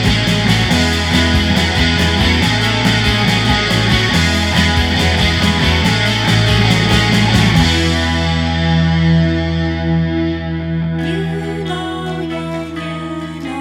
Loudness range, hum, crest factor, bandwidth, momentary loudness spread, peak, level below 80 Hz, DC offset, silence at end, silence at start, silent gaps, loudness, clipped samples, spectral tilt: 7 LU; none; 14 dB; 16 kHz; 10 LU; 0 dBFS; -24 dBFS; under 0.1%; 0 s; 0 s; none; -14 LUFS; under 0.1%; -5 dB/octave